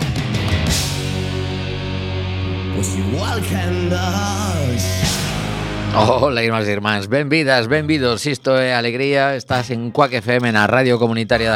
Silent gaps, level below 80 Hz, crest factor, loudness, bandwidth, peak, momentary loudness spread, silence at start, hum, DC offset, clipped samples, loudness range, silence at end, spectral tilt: none; -36 dBFS; 18 dB; -18 LUFS; 16.5 kHz; 0 dBFS; 8 LU; 0 s; none; under 0.1%; under 0.1%; 4 LU; 0 s; -5 dB/octave